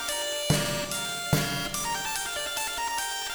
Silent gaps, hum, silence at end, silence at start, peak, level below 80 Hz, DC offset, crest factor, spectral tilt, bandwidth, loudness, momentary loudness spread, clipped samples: none; none; 0 s; 0 s; -8 dBFS; -48 dBFS; under 0.1%; 22 dB; -2.5 dB/octave; over 20 kHz; -28 LUFS; 3 LU; under 0.1%